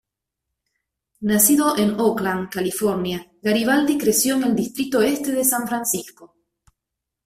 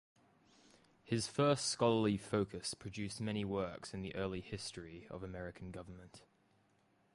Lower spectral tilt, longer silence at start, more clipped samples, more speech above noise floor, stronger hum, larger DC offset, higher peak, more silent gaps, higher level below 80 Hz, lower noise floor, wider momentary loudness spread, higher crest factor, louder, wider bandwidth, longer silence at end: second, -3.5 dB/octave vs -5 dB/octave; first, 1.2 s vs 1.05 s; neither; first, 63 dB vs 35 dB; neither; neither; first, -2 dBFS vs -20 dBFS; neither; first, -58 dBFS vs -64 dBFS; first, -83 dBFS vs -74 dBFS; second, 9 LU vs 17 LU; about the same, 20 dB vs 20 dB; first, -20 LUFS vs -39 LUFS; first, 16 kHz vs 11.5 kHz; about the same, 1 s vs 0.95 s